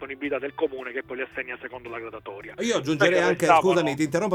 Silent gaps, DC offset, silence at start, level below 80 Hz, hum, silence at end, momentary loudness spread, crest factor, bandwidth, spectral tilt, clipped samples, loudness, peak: none; under 0.1%; 0 s; -62 dBFS; none; 0 s; 17 LU; 20 dB; 16.5 kHz; -5 dB/octave; under 0.1%; -24 LUFS; -4 dBFS